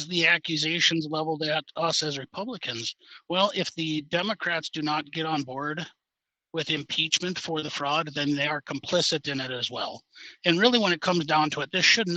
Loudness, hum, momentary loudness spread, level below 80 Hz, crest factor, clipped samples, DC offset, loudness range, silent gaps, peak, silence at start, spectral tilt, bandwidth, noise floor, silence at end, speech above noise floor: -26 LUFS; none; 12 LU; -72 dBFS; 24 dB; under 0.1%; under 0.1%; 4 LU; none; -4 dBFS; 0 s; -3.5 dB/octave; 9.2 kHz; -88 dBFS; 0 s; 61 dB